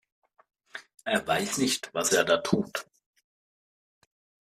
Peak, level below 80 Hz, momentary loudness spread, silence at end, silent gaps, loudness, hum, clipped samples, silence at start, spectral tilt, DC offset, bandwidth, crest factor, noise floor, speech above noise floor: -8 dBFS; -66 dBFS; 19 LU; 1.65 s; none; -27 LUFS; none; under 0.1%; 0.75 s; -3 dB/octave; under 0.1%; 15.5 kHz; 24 dB; under -90 dBFS; over 63 dB